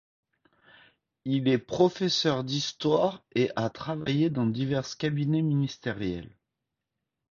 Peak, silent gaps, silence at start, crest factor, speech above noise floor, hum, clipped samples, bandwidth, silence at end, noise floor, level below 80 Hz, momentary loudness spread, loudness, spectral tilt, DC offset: -8 dBFS; none; 1.25 s; 20 dB; 58 dB; none; under 0.1%; 7.4 kHz; 1.05 s; -85 dBFS; -60 dBFS; 8 LU; -28 LUFS; -6 dB/octave; under 0.1%